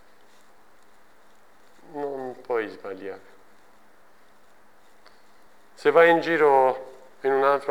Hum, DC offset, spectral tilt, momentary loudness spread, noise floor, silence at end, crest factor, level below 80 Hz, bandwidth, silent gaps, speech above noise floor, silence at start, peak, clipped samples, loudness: none; 0.3%; -5.5 dB/octave; 21 LU; -58 dBFS; 0 s; 22 dB; -74 dBFS; 15 kHz; none; 37 dB; 1.95 s; -4 dBFS; under 0.1%; -22 LUFS